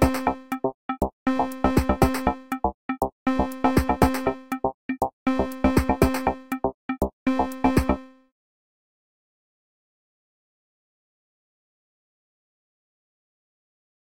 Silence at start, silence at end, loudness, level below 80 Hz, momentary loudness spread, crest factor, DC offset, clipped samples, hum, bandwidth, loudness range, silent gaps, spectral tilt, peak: 0 s; 5.8 s; -25 LUFS; -36 dBFS; 7 LU; 24 dB; 0.8%; under 0.1%; none; 17 kHz; 5 LU; 0.74-0.89 s, 1.13-1.26 s, 2.74-2.89 s, 3.12-3.26 s, 4.74-4.89 s, 5.13-5.26 s, 6.74-6.89 s, 7.13-7.26 s; -6.5 dB/octave; -4 dBFS